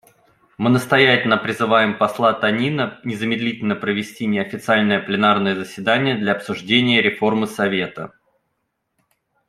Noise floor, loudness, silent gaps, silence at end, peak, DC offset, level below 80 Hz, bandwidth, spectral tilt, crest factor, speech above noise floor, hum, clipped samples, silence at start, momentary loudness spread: -73 dBFS; -18 LUFS; none; 1.4 s; -2 dBFS; under 0.1%; -62 dBFS; 14 kHz; -5.5 dB/octave; 18 dB; 55 dB; none; under 0.1%; 0.6 s; 9 LU